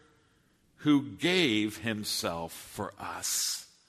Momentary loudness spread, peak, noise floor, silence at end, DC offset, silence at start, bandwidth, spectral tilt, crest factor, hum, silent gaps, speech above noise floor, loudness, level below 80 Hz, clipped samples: 13 LU; -14 dBFS; -67 dBFS; 0.25 s; under 0.1%; 0.8 s; 13.5 kHz; -3 dB/octave; 18 dB; none; none; 37 dB; -30 LUFS; -66 dBFS; under 0.1%